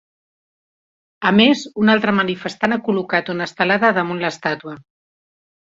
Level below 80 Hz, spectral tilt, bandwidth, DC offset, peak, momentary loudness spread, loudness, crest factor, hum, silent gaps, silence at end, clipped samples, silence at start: -60 dBFS; -5.5 dB/octave; 7.8 kHz; under 0.1%; -2 dBFS; 10 LU; -17 LUFS; 18 dB; none; none; 0.8 s; under 0.1%; 1.2 s